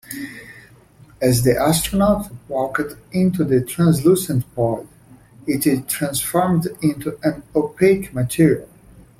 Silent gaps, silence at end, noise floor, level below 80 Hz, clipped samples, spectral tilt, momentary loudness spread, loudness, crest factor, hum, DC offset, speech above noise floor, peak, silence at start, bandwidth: none; 0.2 s; -48 dBFS; -44 dBFS; under 0.1%; -6 dB/octave; 9 LU; -19 LUFS; 18 dB; none; under 0.1%; 29 dB; -2 dBFS; 0.1 s; 16.5 kHz